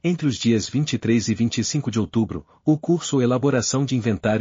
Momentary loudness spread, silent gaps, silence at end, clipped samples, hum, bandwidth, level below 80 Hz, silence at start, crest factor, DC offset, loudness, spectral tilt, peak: 4 LU; none; 0 s; under 0.1%; none; 7.4 kHz; -54 dBFS; 0.05 s; 14 dB; under 0.1%; -22 LUFS; -6 dB/octave; -6 dBFS